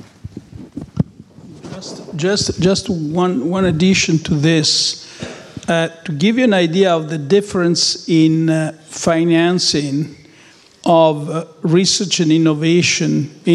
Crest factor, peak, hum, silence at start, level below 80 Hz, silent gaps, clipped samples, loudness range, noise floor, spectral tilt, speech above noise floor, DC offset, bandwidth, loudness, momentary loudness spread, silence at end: 14 dB; -2 dBFS; none; 0.25 s; -48 dBFS; none; under 0.1%; 3 LU; -46 dBFS; -4.5 dB/octave; 31 dB; under 0.1%; 11.5 kHz; -15 LUFS; 17 LU; 0 s